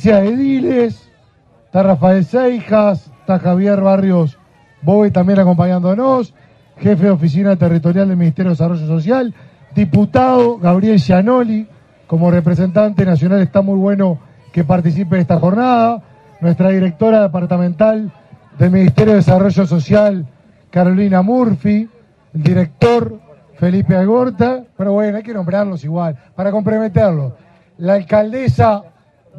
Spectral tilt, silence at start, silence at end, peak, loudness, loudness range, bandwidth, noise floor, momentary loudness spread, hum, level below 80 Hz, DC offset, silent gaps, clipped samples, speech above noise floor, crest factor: -9.5 dB/octave; 0 s; 0.55 s; 0 dBFS; -13 LUFS; 3 LU; 7 kHz; -50 dBFS; 9 LU; none; -48 dBFS; under 0.1%; none; under 0.1%; 38 dB; 12 dB